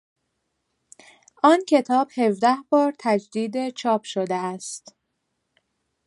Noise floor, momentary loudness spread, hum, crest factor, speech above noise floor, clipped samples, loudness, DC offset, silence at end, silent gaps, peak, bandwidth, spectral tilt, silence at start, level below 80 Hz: -76 dBFS; 10 LU; none; 20 dB; 55 dB; under 0.1%; -22 LUFS; under 0.1%; 1.3 s; none; -4 dBFS; 11.5 kHz; -5 dB/octave; 1.45 s; -76 dBFS